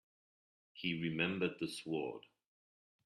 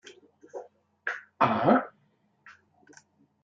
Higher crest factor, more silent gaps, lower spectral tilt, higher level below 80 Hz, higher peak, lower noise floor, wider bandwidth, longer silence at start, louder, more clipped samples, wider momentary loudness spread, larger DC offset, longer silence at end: about the same, 22 dB vs 24 dB; neither; second, -5.5 dB/octave vs -7 dB/octave; about the same, -78 dBFS vs -76 dBFS; second, -20 dBFS vs -6 dBFS; first, under -90 dBFS vs -69 dBFS; first, 14 kHz vs 7.8 kHz; first, 0.75 s vs 0.05 s; second, -39 LUFS vs -27 LUFS; neither; second, 12 LU vs 22 LU; neither; about the same, 0.85 s vs 0.9 s